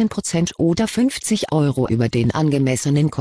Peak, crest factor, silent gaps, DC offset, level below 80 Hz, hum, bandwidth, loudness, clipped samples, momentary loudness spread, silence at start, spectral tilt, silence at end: -6 dBFS; 12 dB; none; 0.1%; -46 dBFS; none; 11 kHz; -19 LUFS; under 0.1%; 2 LU; 0 s; -6 dB/octave; 0 s